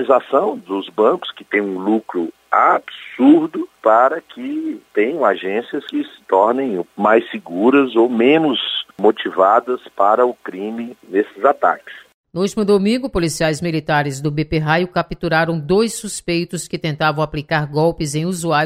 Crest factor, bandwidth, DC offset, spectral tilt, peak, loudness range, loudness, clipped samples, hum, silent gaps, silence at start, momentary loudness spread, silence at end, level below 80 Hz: 16 dB; 15.5 kHz; under 0.1%; -5.5 dB/octave; -2 dBFS; 3 LU; -17 LUFS; under 0.1%; none; 12.14-12.24 s; 0 s; 11 LU; 0 s; -46 dBFS